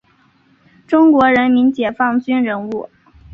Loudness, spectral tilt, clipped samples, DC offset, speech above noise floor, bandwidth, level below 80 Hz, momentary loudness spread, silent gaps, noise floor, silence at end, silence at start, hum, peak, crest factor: -14 LUFS; -7 dB/octave; under 0.1%; under 0.1%; 41 dB; 5.2 kHz; -52 dBFS; 12 LU; none; -54 dBFS; 0.5 s; 0.9 s; none; -2 dBFS; 14 dB